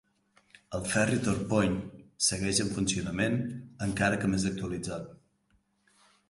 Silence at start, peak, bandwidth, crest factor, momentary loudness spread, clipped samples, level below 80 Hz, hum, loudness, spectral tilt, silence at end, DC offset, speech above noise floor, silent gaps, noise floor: 0.7 s; -12 dBFS; 11.5 kHz; 20 dB; 11 LU; under 0.1%; -52 dBFS; none; -30 LUFS; -4 dB/octave; 1.15 s; under 0.1%; 42 dB; none; -71 dBFS